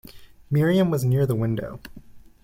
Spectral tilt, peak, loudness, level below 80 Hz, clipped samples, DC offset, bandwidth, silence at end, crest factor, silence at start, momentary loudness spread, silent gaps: -7.5 dB/octave; -10 dBFS; -22 LUFS; -50 dBFS; under 0.1%; under 0.1%; 16.5 kHz; 0.25 s; 14 dB; 0.15 s; 14 LU; none